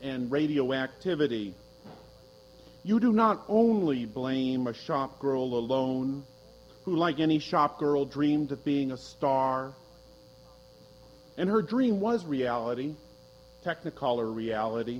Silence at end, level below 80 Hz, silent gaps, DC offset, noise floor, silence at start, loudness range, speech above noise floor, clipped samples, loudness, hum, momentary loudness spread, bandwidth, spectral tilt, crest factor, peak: 0 s; -62 dBFS; none; under 0.1%; -54 dBFS; 0 s; 4 LU; 26 dB; under 0.1%; -29 LUFS; none; 10 LU; 10.5 kHz; -7 dB/octave; 18 dB; -10 dBFS